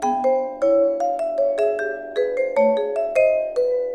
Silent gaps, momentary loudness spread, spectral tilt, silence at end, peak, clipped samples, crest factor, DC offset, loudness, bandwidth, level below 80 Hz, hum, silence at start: none; 5 LU; -4.5 dB/octave; 0 s; -6 dBFS; under 0.1%; 14 dB; under 0.1%; -21 LUFS; 10 kHz; -58 dBFS; none; 0 s